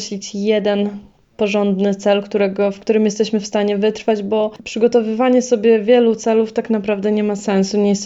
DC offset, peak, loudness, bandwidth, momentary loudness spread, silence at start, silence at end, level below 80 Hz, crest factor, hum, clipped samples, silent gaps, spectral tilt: under 0.1%; -2 dBFS; -17 LUFS; 8 kHz; 6 LU; 0 s; 0 s; -58 dBFS; 14 dB; none; under 0.1%; none; -5.5 dB/octave